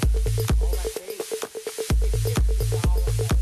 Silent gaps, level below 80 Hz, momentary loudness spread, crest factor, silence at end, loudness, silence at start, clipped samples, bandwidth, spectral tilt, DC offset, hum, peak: none; -24 dBFS; 8 LU; 10 dB; 0 s; -25 LUFS; 0 s; under 0.1%; 14 kHz; -5.5 dB/octave; under 0.1%; none; -12 dBFS